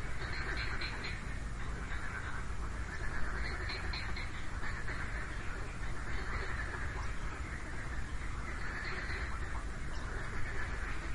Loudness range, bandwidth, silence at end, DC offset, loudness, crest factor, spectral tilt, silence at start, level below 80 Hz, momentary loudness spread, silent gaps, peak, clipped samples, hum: 1 LU; 11.5 kHz; 0 s; 0.4%; -41 LUFS; 14 dB; -4.5 dB/octave; 0 s; -42 dBFS; 4 LU; none; -22 dBFS; under 0.1%; none